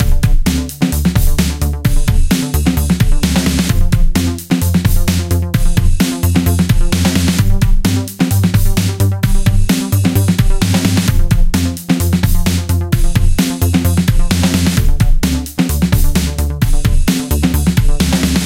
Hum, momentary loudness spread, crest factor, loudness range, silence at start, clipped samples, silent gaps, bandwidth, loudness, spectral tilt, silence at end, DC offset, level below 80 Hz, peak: none; 3 LU; 10 dB; 1 LU; 0 s; under 0.1%; none; 16.5 kHz; -14 LUFS; -5.5 dB/octave; 0 s; under 0.1%; -14 dBFS; 0 dBFS